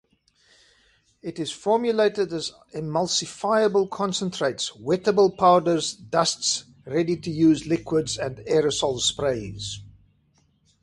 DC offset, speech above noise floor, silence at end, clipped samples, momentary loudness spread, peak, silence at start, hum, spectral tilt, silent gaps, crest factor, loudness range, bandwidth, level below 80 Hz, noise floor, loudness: under 0.1%; 41 dB; 0.9 s; under 0.1%; 12 LU; -6 dBFS; 1.25 s; none; -4 dB/octave; none; 18 dB; 4 LU; 11.5 kHz; -56 dBFS; -64 dBFS; -23 LUFS